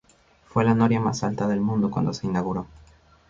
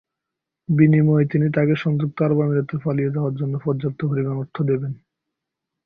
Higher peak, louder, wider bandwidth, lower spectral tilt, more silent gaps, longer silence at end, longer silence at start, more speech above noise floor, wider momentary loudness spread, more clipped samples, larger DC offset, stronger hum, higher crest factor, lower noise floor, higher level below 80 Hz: about the same, -6 dBFS vs -4 dBFS; second, -24 LUFS vs -20 LUFS; first, 7.6 kHz vs 4.9 kHz; second, -7 dB/octave vs -11 dB/octave; neither; second, 0.65 s vs 0.9 s; second, 0.55 s vs 0.7 s; second, 34 dB vs 64 dB; about the same, 9 LU vs 9 LU; neither; neither; neither; about the same, 18 dB vs 18 dB; second, -57 dBFS vs -84 dBFS; first, -52 dBFS vs -58 dBFS